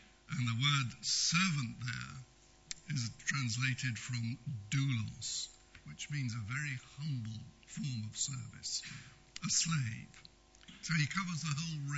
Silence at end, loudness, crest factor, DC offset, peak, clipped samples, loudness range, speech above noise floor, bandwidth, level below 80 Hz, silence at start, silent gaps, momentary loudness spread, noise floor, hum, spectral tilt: 0 s; -37 LUFS; 20 dB; under 0.1%; -18 dBFS; under 0.1%; 6 LU; 22 dB; 8.2 kHz; -66 dBFS; 0 s; none; 17 LU; -59 dBFS; none; -2.5 dB/octave